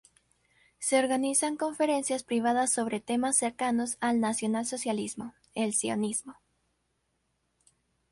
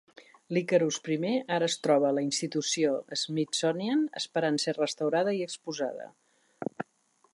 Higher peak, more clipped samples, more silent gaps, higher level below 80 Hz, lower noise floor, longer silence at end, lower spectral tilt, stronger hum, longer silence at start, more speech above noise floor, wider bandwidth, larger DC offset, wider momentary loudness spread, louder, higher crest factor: about the same, -12 dBFS vs -12 dBFS; neither; neither; first, -72 dBFS vs -82 dBFS; first, -77 dBFS vs -69 dBFS; first, 1.8 s vs 0.5 s; about the same, -3 dB/octave vs -4 dB/octave; neither; first, 0.8 s vs 0.2 s; first, 48 dB vs 40 dB; about the same, 11.5 kHz vs 11.5 kHz; neither; second, 7 LU vs 12 LU; about the same, -29 LUFS vs -29 LUFS; about the same, 20 dB vs 18 dB